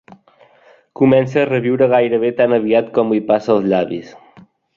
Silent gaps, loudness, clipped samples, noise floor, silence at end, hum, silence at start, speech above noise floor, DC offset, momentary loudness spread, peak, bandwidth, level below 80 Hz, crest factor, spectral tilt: none; -15 LUFS; under 0.1%; -50 dBFS; 0.6 s; none; 1 s; 36 dB; under 0.1%; 4 LU; -2 dBFS; 7.2 kHz; -58 dBFS; 14 dB; -8 dB/octave